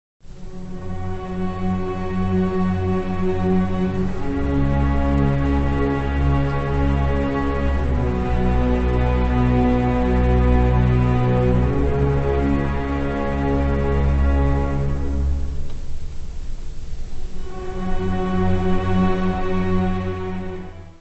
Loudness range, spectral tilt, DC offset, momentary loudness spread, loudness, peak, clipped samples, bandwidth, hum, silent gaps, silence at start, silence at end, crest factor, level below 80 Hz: 7 LU; -9 dB/octave; under 0.1%; 16 LU; -21 LUFS; -6 dBFS; under 0.1%; 7.8 kHz; none; none; 0.25 s; 0.1 s; 14 dB; -24 dBFS